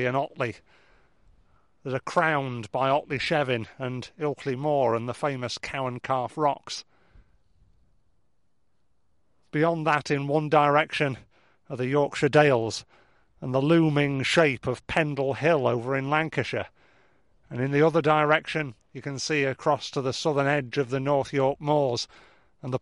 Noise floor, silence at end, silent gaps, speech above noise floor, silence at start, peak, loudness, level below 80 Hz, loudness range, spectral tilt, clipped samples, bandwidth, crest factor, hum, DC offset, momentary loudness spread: -75 dBFS; 0.05 s; none; 50 dB; 0 s; -6 dBFS; -25 LUFS; -60 dBFS; 7 LU; -5.5 dB/octave; under 0.1%; 11.5 kHz; 22 dB; none; under 0.1%; 12 LU